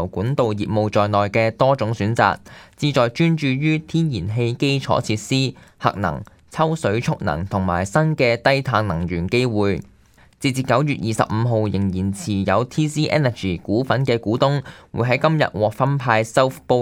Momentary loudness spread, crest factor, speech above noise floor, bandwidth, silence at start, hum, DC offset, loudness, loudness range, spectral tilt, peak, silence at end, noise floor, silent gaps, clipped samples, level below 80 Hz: 6 LU; 20 dB; 32 dB; 15.5 kHz; 0 s; none; under 0.1%; -20 LUFS; 2 LU; -6.5 dB/octave; 0 dBFS; 0 s; -52 dBFS; none; under 0.1%; -48 dBFS